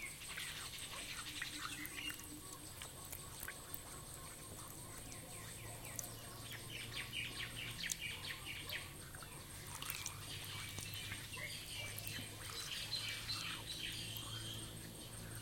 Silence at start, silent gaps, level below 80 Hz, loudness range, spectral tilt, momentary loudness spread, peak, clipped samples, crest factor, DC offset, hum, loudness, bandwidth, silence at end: 0 s; none; -62 dBFS; 5 LU; -2 dB/octave; 8 LU; -18 dBFS; under 0.1%; 30 dB; under 0.1%; none; -46 LUFS; 17 kHz; 0 s